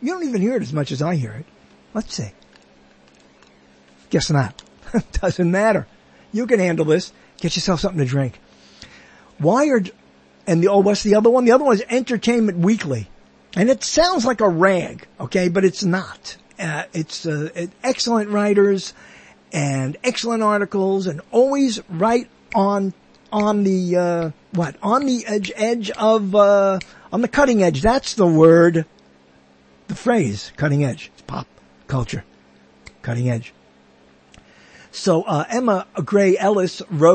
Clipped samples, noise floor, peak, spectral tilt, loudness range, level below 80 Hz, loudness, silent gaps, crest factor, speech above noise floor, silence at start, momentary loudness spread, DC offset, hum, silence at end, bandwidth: under 0.1%; -52 dBFS; 0 dBFS; -6 dB/octave; 9 LU; -44 dBFS; -19 LUFS; none; 18 dB; 34 dB; 0 s; 13 LU; under 0.1%; none; 0 s; 8.8 kHz